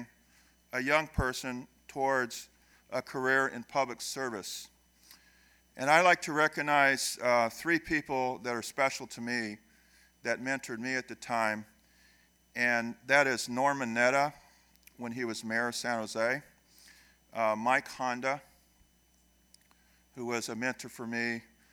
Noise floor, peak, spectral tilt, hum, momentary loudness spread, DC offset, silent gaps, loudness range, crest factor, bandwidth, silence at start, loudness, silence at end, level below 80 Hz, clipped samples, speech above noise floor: -67 dBFS; -8 dBFS; -3.5 dB/octave; none; 14 LU; under 0.1%; none; 8 LU; 24 dB; over 20 kHz; 0 s; -31 LUFS; 0.3 s; -58 dBFS; under 0.1%; 36 dB